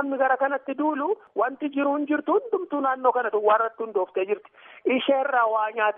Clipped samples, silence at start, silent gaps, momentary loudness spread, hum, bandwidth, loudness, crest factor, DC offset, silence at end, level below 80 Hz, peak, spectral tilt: under 0.1%; 0 s; none; 6 LU; none; 3.8 kHz; -24 LUFS; 16 dB; under 0.1%; 0 s; -86 dBFS; -8 dBFS; -1 dB/octave